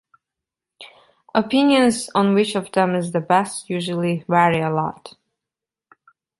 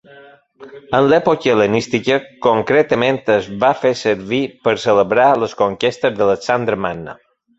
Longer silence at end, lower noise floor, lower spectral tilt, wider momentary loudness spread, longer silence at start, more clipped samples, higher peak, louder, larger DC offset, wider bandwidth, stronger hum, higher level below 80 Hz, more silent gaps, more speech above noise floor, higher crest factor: first, 1.3 s vs 0.45 s; first, -87 dBFS vs -44 dBFS; about the same, -5.5 dB/octave vs -5.5 dB/octave; first, 9 LU vs 6 LU; first, 0.8 s vs 0.15 s; neither; about the same, -2 dBFS vs 0 dBFS; second, -19 LUFS vs -16 LUFS; neither; first, 11.5 kHz vs 8 kHz; neither; second, -62 dBFS vs -52 dBFS; neither; first, 68 dB vs 28 dB; about the same, 20 dB vs 16 dB